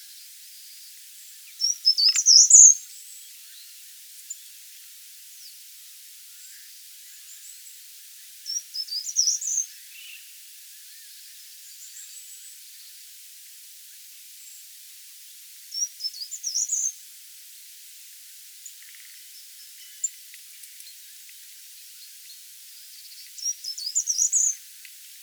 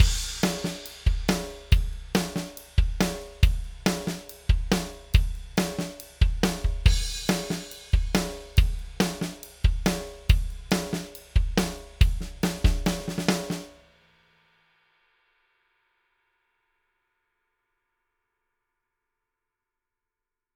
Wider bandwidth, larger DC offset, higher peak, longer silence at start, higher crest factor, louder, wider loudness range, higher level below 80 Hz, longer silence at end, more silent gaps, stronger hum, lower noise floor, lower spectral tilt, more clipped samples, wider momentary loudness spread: about the same, over 20 kHz vs over 20 kHz; neither; first, 0 dBFS vs -4 dBFS; first, 1.6 s vs 0 s; first, 28 dB vs 22 dB; first, -19 LUFS vs -27 LUFS; first, 26 LU vs 4 LU; second, under -90 dBFS vs -28 dBFS; second, 0.65 s vs 6.85 s; neither; neither; second, -46 dBFS vs -87 dBFS; second, 14 dB/octave vs -5 dB/octave; neither; first, 22 LU vs 8 LU